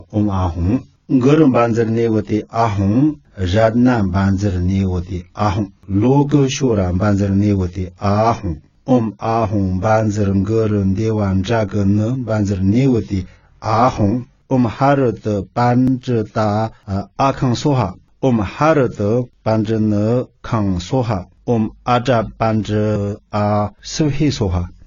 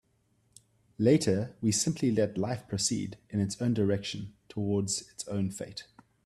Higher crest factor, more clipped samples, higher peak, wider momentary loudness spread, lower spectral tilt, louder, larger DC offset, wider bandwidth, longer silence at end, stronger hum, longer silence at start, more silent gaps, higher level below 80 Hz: about the same, 16 dB vs 20 dB; neither; first, 0 dBFS vs -12 dBFS; second, 7 LU vs 12 LU; first, -7.5 dB/octave vs -5 dB/octave; first, -17 LUFS vs -30 LUFS; neither; second, 7.4 kHz vs 13.5 kHz; second, 0.15 s vs 0.45 s; neither; second, 0.1 s vs 1 s; neither; first, -38 dBFS vs -64 dBFS